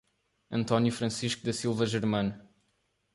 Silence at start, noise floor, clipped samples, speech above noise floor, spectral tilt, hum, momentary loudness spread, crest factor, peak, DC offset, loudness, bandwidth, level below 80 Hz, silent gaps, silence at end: 0.5 s; -75 dBFS; under 0.1%; 46 dB; -5.5 dB/octave; none; 8 LU; 20 dB; -10 dBFS; under 0.1%; -30 LUFS; 11.5 kHz; -62 dBFS; none; 0.75 s